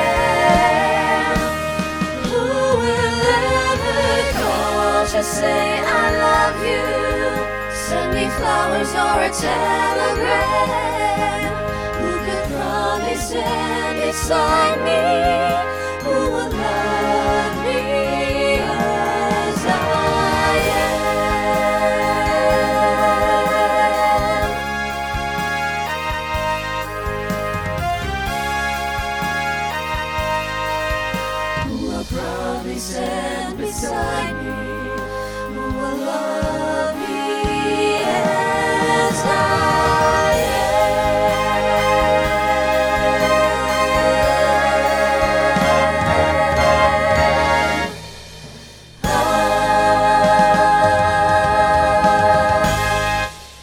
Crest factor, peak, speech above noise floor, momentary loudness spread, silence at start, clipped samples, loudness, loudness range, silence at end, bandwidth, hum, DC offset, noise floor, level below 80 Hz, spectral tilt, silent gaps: 16 dB; -2 dBFS; 21 dB; 8 LU; 0 s; under 0.1%; -18 LUFS; 7 LU; 0 s; over 20 kHz; none; under 0.1%; -39 dBFS; -34 dBFS; -4 dB/octave; none